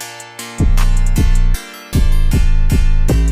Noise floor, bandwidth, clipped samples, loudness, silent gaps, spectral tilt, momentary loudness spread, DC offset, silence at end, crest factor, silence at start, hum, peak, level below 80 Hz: -30 dBFS; 15 kHz; under 0.1%; -17 LUFS; none; -5.5 dB/octave; 9 LU; under 0.1%; 0 s; 10 dB; 0 s; none; -2 dBFS; -12 dBFS